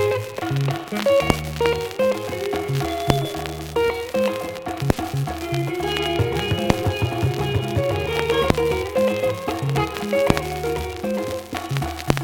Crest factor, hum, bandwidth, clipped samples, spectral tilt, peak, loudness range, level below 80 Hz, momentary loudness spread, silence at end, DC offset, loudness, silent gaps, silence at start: 22 dB; none; 17.5 kHz; under 0.1%; -5.5 dB/octave; 0 dBFS; 2 LU; -38 dBFS; 6 LU; 0 s; under 0.1%; -23 LUFS; none; 0 s